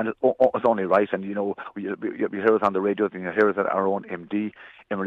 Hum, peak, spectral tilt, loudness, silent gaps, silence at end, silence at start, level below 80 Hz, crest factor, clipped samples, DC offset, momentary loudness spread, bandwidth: none; -6 dBFS; -8.5 dB/octave; -24 LUFS; none; 0 s; 0 s; -70 dBFS; 16 dB; under 0.1%; under 0.1%; 10 LU; 5.8 kHz